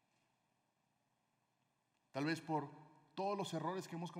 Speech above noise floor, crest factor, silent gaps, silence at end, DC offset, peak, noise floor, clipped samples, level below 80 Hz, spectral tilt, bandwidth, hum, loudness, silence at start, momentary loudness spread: 41 dB; 20 dB; none; 0 s; under 0.1%; -26 dBFS; -83 dBFS; under 0.1%; under -90 dBFS; -5.5 dB/octave; 15.5 kHz; 60 Hz at -90 dBFS; -43 LUFS; 2.15 s; 13 LU